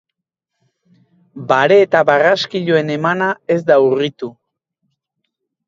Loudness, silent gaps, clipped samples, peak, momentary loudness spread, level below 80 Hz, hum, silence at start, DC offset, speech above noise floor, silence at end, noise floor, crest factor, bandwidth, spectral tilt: -14 LUFS; none; under 0.1%; 0 dBFS; 11 LU; -66 dBFS; none; 1.35 s; under 0.1%; 65 dB; 1.35 s; -79 dBFS; 16 dB; 7.4 kHz; -6 dB/octave